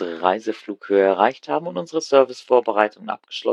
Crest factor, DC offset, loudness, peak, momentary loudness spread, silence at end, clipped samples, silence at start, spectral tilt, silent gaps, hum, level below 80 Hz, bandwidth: 20 dB; under 0.1%; -20 LUFS; 0 dBFS; 11 LU; 0 s; under 0.1%; 0 s; -4.5 dB/octave; none; none; -70 dBFS; 9.6 kHz